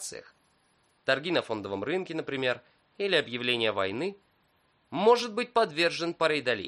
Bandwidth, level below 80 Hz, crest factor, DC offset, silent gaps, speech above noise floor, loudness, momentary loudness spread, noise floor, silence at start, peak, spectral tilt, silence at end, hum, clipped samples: 11.5 kHz; -74 dBFS; 20 dB; under 0.1%; none; 40 dB; -28 LUFS; 11 LU; -69 dBFS; 0 s; -10 dBFS; -4 dB/octave; 0 s; none; under 0.1%